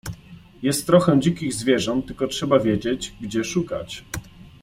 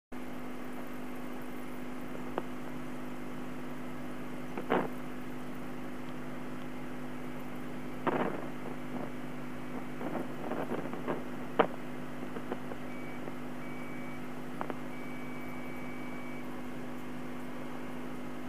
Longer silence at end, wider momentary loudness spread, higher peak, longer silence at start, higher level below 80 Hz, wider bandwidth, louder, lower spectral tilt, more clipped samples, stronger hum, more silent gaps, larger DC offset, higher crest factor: first, 0.15 s vs 0 s; first, 15 LU vs 9 LU; first, -2 dBFS vs -8 dBFS; about the same, 0.05 s vs 0.1 s; first, -48 dBFS vs -64 dBFS; about the same, 16 kHz vs 15.5 kHz; first, -22 LUFS vs -40 LUFS; about the same, -5.5 dB/octave vs -6 dB/octave; neither; second, none vs 50 Hz at -55 dBFS; neither; second, under 0.1% vs 1%; second, 20 dB vs 32 dB